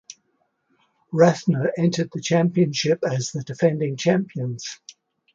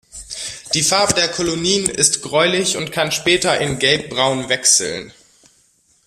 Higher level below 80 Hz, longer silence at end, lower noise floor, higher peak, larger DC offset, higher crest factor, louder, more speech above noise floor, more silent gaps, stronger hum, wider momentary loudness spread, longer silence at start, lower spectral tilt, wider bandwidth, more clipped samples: second, -66 dBFS vs -48 dBFS; second, 0.45 s vs 0.95 s; first, -70 dBFS vs -58 dBFS; second, -4 dBFS vs 0 dBFS; neither; about the same, 20 dB vs 18 dB; second, -22 LUFS vs -16 LUFS; first, 49 dB vs 40 dB; neither; neither; about the same, 11 LU vs 12 LU; about the same, 0.1 s vs 0.15 s; first, -6 dB/octave vs -2 dB/octave; second, 7.6 kHz vs 15.5 kHz; neither